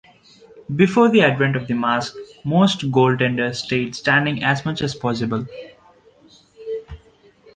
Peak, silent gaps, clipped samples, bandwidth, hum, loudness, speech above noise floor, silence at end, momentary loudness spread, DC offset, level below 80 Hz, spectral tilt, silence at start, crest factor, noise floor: -2 dBFS; none; under 0.1%; 9.6 kHz; none; -19 LUFS; 33 dB; 0.6 s; 16 LU; under 0.1%; -52 dBFS; -6 dB/octave; 0.55 s; 18 dB; -52 dBFS